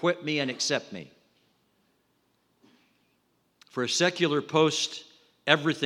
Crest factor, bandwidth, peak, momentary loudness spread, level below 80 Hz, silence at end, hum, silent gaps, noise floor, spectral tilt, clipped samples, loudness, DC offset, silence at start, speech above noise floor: 26 dB; 15 kHz; -4 dBFS; 15 LU; -82 dBFS; 0 s; none; none; -71 dBFS; -3.5 dB/octave; under 0.1%; -26 LUFS; under 0.1%; 0 s; 44 dB